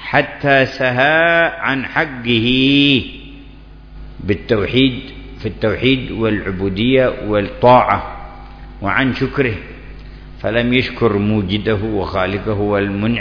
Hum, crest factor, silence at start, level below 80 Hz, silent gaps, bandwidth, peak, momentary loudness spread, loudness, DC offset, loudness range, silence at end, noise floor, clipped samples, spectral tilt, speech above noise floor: none; 16 dB; 0 s; -36 dBFS; none; 5.4 kHz; 0 dBFS; 16 LU; -15 LUFS; under 0.1%; 5 LU; 0 s; -38 dBFS; under 0.1%; -7.5 dB/octave; 22 dB